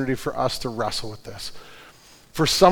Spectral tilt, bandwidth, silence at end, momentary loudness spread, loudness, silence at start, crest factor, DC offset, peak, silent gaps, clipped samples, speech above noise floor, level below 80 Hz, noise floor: -4 dB/octave; 19.5 kHz; 0 s; 22 LU; -25 LUFS; 0 s; 22 dB; under 0.1%; 0 dBFS; none; under 0.1%; 27 dB; -46 dBFS; -50 dBFS